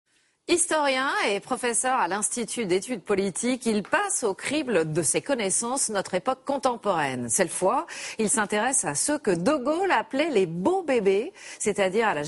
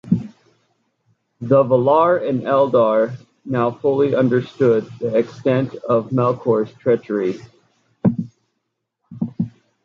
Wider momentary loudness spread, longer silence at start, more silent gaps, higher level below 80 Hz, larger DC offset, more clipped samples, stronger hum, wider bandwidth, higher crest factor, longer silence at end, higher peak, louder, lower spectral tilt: second, 5 LU vs 13 LU; first, 0.5 s vs 0.05 s; neither; second, -64 dBFS vs -58 dBFS; neither; neither; neither; first, 11.5 kHz vs 7 kHz; about the same, 18 dB vs 16 dB; second, 0 s vs 0.35 s; second, -8 dBFS vs -2 dBFS; second, -25 LUFS vs -18 LUFS; second, -3 dB/octave vs -9 dB/octave